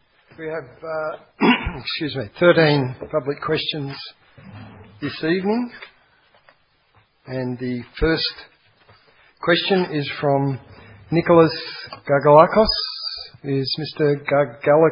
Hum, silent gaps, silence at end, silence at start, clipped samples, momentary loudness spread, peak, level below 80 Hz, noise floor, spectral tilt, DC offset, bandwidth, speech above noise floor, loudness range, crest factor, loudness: none; none; 0 s; 0.4 s; under 0.1%; 17 LU; 0 dBFS; -42 dBFS; -59 dBFS; -10 dB/octave; under 0.1%; 5.4 kHz; 40 dB; 10 LU; 20 dB; -20 LUFS